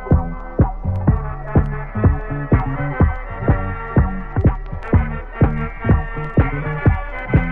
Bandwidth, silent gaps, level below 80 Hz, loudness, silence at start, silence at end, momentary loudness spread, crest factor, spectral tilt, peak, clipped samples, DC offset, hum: 3.7 kHz; none; -24 dBFS; -20 LUFS; 0 s; 0 s; 5 LU; 18 dB; -11.5 dB/octave; 0 dBFS; under 0.1%; under 0.1%; none